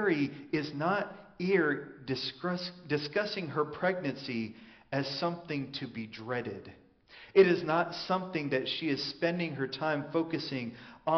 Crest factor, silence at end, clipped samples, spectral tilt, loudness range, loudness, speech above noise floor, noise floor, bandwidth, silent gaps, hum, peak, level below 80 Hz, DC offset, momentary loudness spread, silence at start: 22 dB; 0 s; under 0.1%; -4 dB/octave; 5 LU; -32 LUFS; 24 dB; -56 dBFS; 6.4 kHz; none; none; -10 dBFS; -70 dBFS; under 0.1%; 10 LU; 0 s